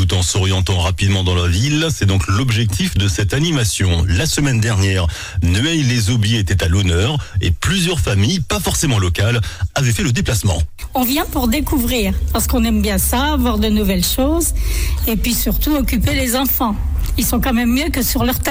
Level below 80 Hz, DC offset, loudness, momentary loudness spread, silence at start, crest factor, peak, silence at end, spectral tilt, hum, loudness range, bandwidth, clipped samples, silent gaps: -24 dBFS; under 0.1%; -16 LUFS; 3 LU; 0 s; 10 dB; -6 dBFS; 0 s; -4.5 dB/octave; none; 1 LU; 17 kHz; under 0.1%; none